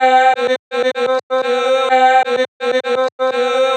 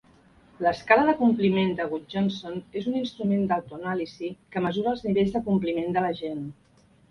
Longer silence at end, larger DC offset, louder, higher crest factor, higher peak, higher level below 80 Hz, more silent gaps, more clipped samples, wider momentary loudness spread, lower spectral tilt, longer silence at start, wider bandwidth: second, 0 s vs 0.6 s; neither; first, -15 LUFS vs -26 LUFS; second, 14 dB vs 22 dB; about the same, -2 dBFS vs -4 dBFS; second, -82 dBFS vs -58 dBFS; first, 0.59-0.71 s, 1.23-1.30 s, 2.48-2.60 s, 3.12-3.19 s vs none; neither; second, 7 LU vs 13 LU; second, -1.5 dB/octave vs -7.5 dB/octave; second, 0 s vs 0.6 s; first, 9.2 kHz vs 6.8 kHz